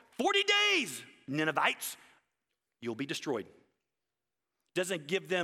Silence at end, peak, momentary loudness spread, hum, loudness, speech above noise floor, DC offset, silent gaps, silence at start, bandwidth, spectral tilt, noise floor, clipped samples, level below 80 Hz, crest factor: 0 s; -14 dBFS; 16 LU; none; -31 LUFS; 58 dB; under 0.1%; none; 0.2 s; 16.5 kHz; -2.5 dB/octave; -90 dBFS; under 0.1%; -84 dBFS; 20 dB